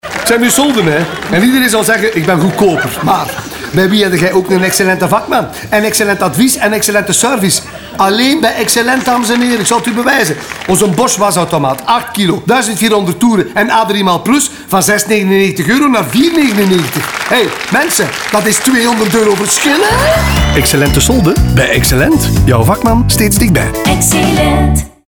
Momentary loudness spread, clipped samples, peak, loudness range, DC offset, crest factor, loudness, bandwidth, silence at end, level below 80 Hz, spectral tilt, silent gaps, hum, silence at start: 4 LU; under 0.1%; 0 dBFS; 2 LU; under 0.1%; 10 dB; -10 LUFS; over 20 kHz; 0.2 s; -24 dBFS; -4 dB/octave; none; none; 0.05 s